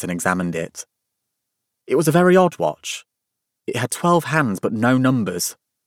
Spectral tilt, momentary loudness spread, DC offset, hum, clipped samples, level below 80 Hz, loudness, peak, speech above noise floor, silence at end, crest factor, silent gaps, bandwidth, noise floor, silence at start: -5.5 dB/octave; 16 LU; under 0.1%; none; under 0.1%; -62 dBFS; -19 LUFS; -2 dBFS; 62 dB; 0.35 s; 18 dB; none; 17 kHz; -80 dBFS; 0 s